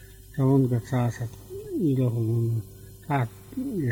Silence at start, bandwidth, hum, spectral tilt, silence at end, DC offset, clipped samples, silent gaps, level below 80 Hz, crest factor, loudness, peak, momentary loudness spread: 0 s; 18.5 kHz; none; -8.5 dB/octave; 0 s; under 0.1%; under 0.1%; none; -52 dBFS; 16 dB; -27 LUFS; -10 dBFS; 14 LU